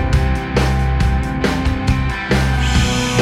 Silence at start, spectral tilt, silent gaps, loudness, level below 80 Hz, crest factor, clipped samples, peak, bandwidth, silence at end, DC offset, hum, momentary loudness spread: 0 s; -5.5 dB/octave; none; -17 LUFS; -20 dBFS; 14 dB; under 0.1%; 0 dBFS; 13.5 kHz; 0 s; under 0.1%; none; 3 LU